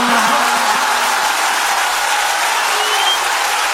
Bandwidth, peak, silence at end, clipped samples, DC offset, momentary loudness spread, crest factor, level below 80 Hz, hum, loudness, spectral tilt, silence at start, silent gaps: 16.5 kHz; 0 dBFS; 0 s; under 0.1%; under 0.1%; 2 LU; 14 dB; -52 dBFS; none; -14 LUFS; 0.5 dB/octave; 0 s; none